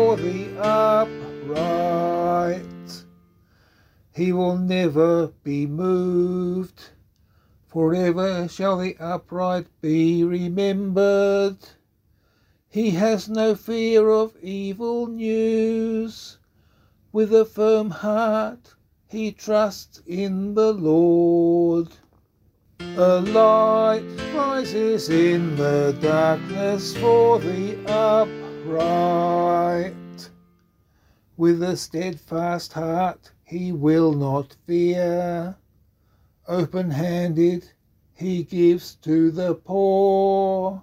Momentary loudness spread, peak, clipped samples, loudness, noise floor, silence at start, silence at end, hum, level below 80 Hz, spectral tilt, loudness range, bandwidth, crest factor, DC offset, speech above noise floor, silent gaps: 12 LU; -4 dBFS; under 0.1%; -21 LUFS; -63 dBFS; 0 s; 0 s; none; -58 dBFS; -7 dB/octave; 5 LU; 15.5 kHz; 18 dB; under 0.1%; 43 dB; none